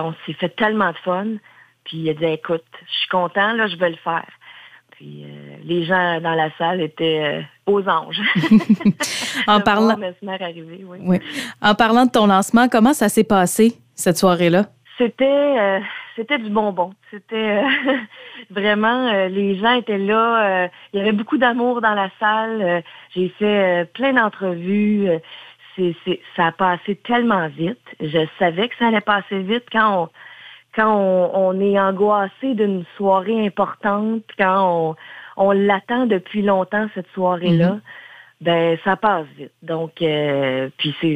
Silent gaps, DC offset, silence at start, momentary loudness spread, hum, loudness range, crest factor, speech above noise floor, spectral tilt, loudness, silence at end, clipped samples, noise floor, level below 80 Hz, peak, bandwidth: none; under 0.1%; 0 s; 12 LU; none; 5 LU; 18 dB; 26 dB; -5 dB/octave; -18 LUFS; 0 s; under 0.1%; -44 dBFS; -60 dBFS; -2 dBFS; 15.5 kHz